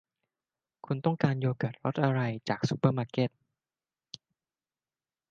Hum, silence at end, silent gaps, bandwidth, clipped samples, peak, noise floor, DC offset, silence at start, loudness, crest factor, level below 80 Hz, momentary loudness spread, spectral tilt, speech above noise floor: none; 2.05 s; none; 7.6 kHz; under 0.1%; -10 dBFS; under -90 dBFS; under 0.1%; 0.9 s; -30 LUFS; 22 dB; -70 dBFS; 20 LU; -7.5 dB/octave; over 61 dB